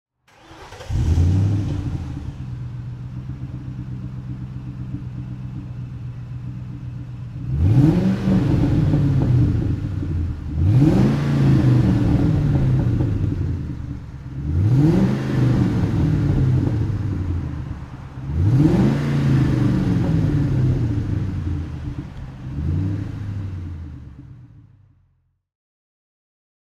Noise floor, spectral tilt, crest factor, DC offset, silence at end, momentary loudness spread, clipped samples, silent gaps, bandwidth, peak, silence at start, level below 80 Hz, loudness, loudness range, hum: -64 dBFS; -9 dB/octave; 18 dB; under 0.1%; 2.2 s; 16 LU; under 0.1%; none; 7.8 kHz; -2 dBFS; 0.5 s; -32 dBFS; -20 LUFS; 13 LU; none